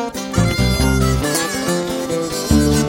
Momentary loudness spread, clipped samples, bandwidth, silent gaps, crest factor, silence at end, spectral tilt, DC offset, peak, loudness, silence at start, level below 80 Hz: 5 LU; under 0.1%; 17 kHz; none; 16 dB; 0 s; -5 dB/octave; under 0.1%; -2 dBFS; -17 LUFS; 0 s; -26 dBFS